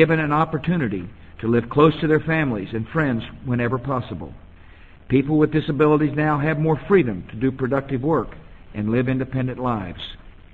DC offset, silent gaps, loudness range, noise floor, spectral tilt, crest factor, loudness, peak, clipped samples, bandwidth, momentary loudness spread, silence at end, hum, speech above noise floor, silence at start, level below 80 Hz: 0.3%; none; 4 LU; -46 dBFS; -9.5 dB/octave; 20 dB; -21 LUFS; -2 dBFS; under 0.1%; 4.5 kHz; 13 LU; 0.2 s; none; 25 dB; 0 s; -44 dBFS